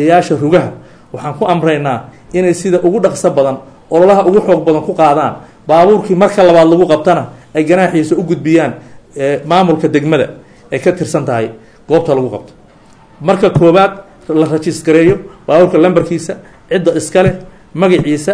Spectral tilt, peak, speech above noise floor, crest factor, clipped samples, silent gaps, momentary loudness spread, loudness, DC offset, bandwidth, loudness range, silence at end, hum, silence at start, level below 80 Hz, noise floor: -6.5 dB/octave; 0 dBFS; 32 dB; 10 dB; 0.4%; none; 13 LU; -11 LUFS; 0.2%; 11 kHz; 4 LU; 0 s; none; 0 s; -42 dBFS; -42 dBFS